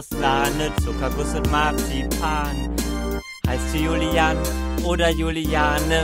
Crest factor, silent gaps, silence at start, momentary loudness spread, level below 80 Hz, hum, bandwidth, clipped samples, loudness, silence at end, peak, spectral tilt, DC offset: 16 dB; none; 0 s; 6 LU; -28 dBFS; none; 16.5 kHz; under 0.1%; -22 LUFS; 0 s; -4 dBFS; -5 dB/octave; under 0.1%